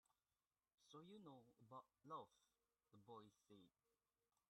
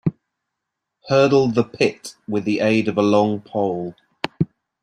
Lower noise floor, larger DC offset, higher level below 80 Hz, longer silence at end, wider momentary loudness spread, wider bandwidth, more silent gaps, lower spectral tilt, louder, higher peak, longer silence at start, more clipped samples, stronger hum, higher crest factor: first, under -90 dBFS vs -81 dBFS; neither; second, under -90 dBFS vs -58 dBFS; first, 0.8 s vs 0.35 s; second, 8 LU vs 13 LU; about the same, 10 kHz vs 11 kHz; neither; about the same, -6 dB/octave vs -6.5 dB/octave; second, -63 LUFS vs -20 LUFS; second, -44 dBFS vs -2 dBFS; about the same, 0.1 s vs 0.05 s; neither; neither; about the same, 22 dB vs 18 dB